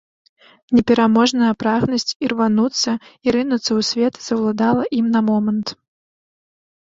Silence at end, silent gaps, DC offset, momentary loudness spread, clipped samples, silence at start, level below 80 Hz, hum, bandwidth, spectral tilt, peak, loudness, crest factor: 1.1 s; 2.16-2.20 s; under 0.1%; 7 LU; under 0.1%; 0.7 s; -54 dBFS; none; 7.8 kHz; -4.5 dB/octave; -2 dBFS; -18 LUFS; 16 dB